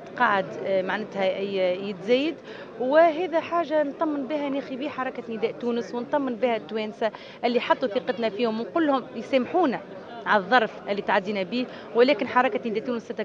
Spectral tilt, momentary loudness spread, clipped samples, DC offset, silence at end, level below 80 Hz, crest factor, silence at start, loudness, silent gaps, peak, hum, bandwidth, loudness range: -6 dB/octave; 9 LU; under 0.1%; under 0.1%; 0 s; -72 dBFS; 20 dB; 0 s; -25 LUFS; none; -6 dBFS; none; 7.4 kHz; 4 LU